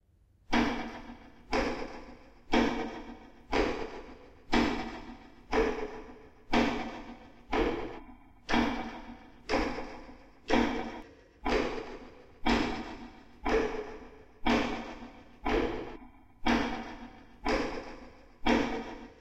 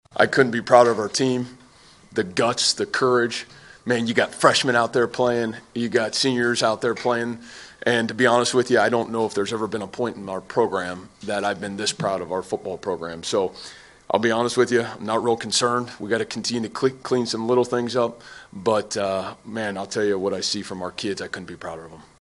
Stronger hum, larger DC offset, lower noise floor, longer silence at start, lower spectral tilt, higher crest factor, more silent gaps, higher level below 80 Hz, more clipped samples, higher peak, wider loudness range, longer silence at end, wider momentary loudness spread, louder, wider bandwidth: neither; neither; first, -63 dBFS vs -51 dBFS; first, 0.5 s vs 0.15 s; first, -5 dB/octave vs -3.5 dB/octave; about the same, 20 dB vs 22 dB; neither; first, -46 dBFS vs -62 dBFS; neither; second, -12 dBFS vs 0 dBFS; second, 1 LU vs 5 LU; second, 0.05 s vs 0.2 s; first, 20 LU vs 12 LU; second, -32 LUFS vs -22 LUFS; about the same, 12.5 kHz vs 11.5 kHz